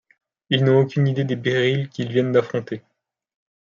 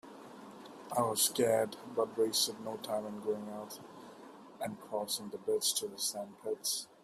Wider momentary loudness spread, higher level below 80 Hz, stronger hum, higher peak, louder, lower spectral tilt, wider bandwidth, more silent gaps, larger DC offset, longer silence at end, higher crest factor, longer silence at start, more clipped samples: second, 11 LU vs 21 LU; first, -66 dBFS vs -80 dBFS; neither; first, -4 dBFS vs -16 dBFS; first, -20 LUFS vs -34 LUFS; first, -7.5 dB/octave vs -2.5 dB/octave; second, 7.2 kHz vs 15.5 kHz; neither; neither; first, 0.95 s vs 0.15 s; about the same, 18 dB vs 20 dB; first, 0.5 s vs 0.05 s; neither